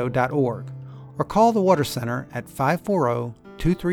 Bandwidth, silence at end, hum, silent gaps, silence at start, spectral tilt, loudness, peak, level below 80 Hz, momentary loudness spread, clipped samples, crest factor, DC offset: 18.5 kHz; 0 s; none; none; 0 s; -6.5 dB/octave; -22 LUFS; -4 dBFS; -44 dBFS; 16 LU; under 0.1%; 18 dB; under 0.1%